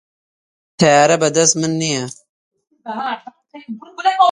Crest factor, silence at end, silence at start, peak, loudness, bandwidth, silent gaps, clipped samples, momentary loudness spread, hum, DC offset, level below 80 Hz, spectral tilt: 18 dB; 0 s; 0.8 s; 0 dBFS; -15 LUFS; 11.5 kHz; 2.29-2.51 s; under 0.1%; 21 LU; none; under 0.1%; -60 dBFS; -3.5 dB/octave